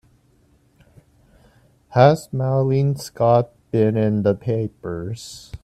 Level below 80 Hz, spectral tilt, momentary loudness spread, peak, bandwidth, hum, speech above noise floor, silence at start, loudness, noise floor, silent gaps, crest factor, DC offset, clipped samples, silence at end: -52 dBFS; -7.5 dB/octave; 14 LU; 0 dBFS; 13.5 kHz; none; 39 dB; 1.9 s; -20 LUFS; -58 dBFS; none; 20 dB; under 0.1%; under 0.1%; 0.05 s